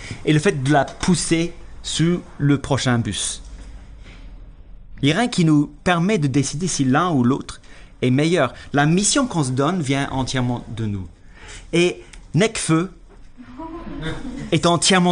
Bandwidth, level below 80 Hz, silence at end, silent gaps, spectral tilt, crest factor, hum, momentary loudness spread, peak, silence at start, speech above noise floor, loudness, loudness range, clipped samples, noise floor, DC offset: 10 kHz; -40 dBFS; 0 s; none; -5 dB/octave; 16 dB; none; 15 LU; -4 dBFS; 0 s; 22 dB; -20 LUFS; 4 LU; under 0.1%; -41 dBFS; under 0.1%